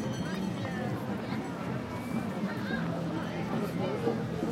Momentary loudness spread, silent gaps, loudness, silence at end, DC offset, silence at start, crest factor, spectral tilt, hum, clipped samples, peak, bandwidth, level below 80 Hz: 4 LU; none; -34 LUFS; 0 s; under 0.1%; 0 s; 16 dB; -6.5 dB/octave; none; under 0.1%; -16 dBFS; 16.5 kHz; -60 dBFS